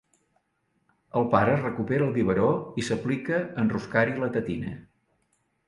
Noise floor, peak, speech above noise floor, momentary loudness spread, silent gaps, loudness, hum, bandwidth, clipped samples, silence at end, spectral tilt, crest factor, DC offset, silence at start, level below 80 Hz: -73 dBFS; -6 dBFS; 48 dB; 9 LU; none; -26 LUFS; none; 11.5 kHz; under 0.1%; 0.85 s; -7 dB/octave; 22 dB; under 0.1%; 1.15 s; -56 dBFS